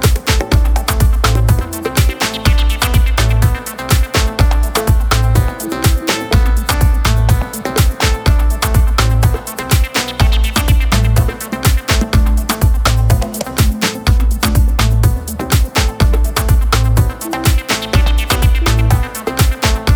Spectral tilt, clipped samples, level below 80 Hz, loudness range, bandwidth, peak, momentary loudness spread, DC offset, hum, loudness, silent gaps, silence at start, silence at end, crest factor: -4.5 dB/octave; under 0.1%; -14 dBFS; 1 LU; over 20 kHz; 0 dBFS; 3 LU; under 0.1%; none; -14 LUFS; none; 0 s; 0 s; 12 dB